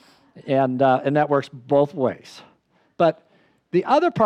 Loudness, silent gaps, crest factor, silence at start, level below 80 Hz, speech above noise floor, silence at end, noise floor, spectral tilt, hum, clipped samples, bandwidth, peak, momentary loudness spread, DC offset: -21 LUFS; none; 14 dB; 0.35 s; -72 dBFS; 32 dB; 0 s; -52 dBFS; -7.5 dB/octave; none; under 0.1%; 9.6 kHz; -6 dBFS; 7 LU; under 0.1%